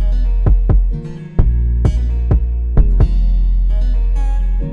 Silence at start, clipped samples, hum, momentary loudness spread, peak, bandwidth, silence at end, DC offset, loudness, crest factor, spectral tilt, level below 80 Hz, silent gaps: 0 s; under 0.1%; none; 4 LU; 0 dBFS; 3.1 kHz; 0 s; under 0.1%; -17 LUFS; 12 dB; -9.5 dB/octave; -12 dBFS; none